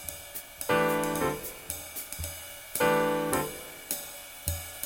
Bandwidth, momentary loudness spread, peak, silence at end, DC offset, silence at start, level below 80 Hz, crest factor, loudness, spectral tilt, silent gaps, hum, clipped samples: 17 kHz; 13 LU; -10 dBFS; 0 s; under 0.1%; 0 s; -50 dBFS; 22 dB; -31 LUFS; -3.5 dB/octave; none; none; under 0.1%